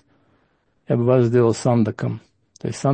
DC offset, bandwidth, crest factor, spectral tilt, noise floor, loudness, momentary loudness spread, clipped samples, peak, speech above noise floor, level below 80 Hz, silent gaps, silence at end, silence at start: under 0.1%; 8.8 kHz; 18 dB; -7.5 dB/octave; -65 dBFS; -19 LUFS; 14 LU; under 0.1%; -4 dBFS; 46 dB; -60 dBFS; none; 0 s; 0.9 s